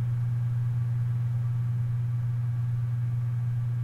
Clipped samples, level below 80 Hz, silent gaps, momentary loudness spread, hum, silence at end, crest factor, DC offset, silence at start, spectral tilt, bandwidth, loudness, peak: under 0.1%; -54 dBFS; none; 1 LU; none; 0 s; 6 dB; under 0.1%; 0 s; -9.5 dB/octave; 2.6 kHz; -29 LUFS; -22 dBFS